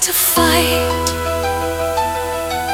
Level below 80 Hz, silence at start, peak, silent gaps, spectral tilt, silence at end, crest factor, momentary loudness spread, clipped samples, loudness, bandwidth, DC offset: -36 dBFS; 0 s; 0 dBFS; none; -3 dB/octave; 0 s; 16 dB; 8 LU; under 0.1%; -16 LUFS; 18 kHz; under 0.1%